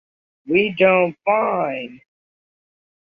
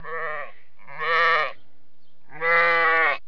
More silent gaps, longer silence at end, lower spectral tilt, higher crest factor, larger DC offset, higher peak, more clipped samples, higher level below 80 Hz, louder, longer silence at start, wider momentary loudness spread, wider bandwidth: neither; first, 1.1 s vs 0.1 s; first, -8.5 dB/octave vs -3.5 dB/octave; about the same, 18 dB vs 16 dB; second, under 0.1% vs 2%; first, -4 dBFS vs -8 dBFS; neither; first, -62 dBFS vs -72 dBFS; first, -18 LUFS vs -21 LUFS; first, 0.45 s vs 0.05 s; about the same, 12 LU vs 14 LU; second, 4.9 kHz vs 5.4 kHz